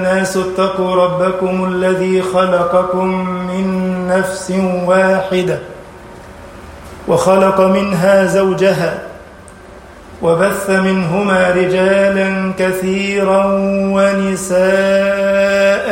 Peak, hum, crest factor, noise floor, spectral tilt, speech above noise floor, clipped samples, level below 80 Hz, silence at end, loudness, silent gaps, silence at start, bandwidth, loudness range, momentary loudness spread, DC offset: 0 dBFS; none; 12 dB; -36 dBFS; -6 dB/octave; 23 dB; under 0.1%; -44 dBFS; 0 s; -13 LUFS; none; 0 s; 16.5 kHz; 3 LU; 8 LU; under 0.1%